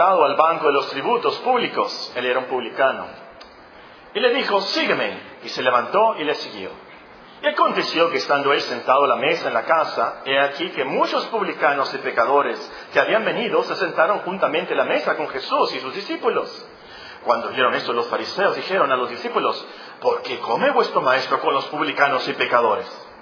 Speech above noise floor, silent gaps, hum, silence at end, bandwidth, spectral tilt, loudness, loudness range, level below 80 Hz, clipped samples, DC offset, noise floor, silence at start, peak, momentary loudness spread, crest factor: 24 dB; none; none; 0 s; 5.4 kHz; -4 dB/octave; -20 LUFS; 3 LU; -68 dBFS; under 0.1%; under 0.1%; -44 dBFS; 0 s; 0 dBFS; 9 LU; 20 dB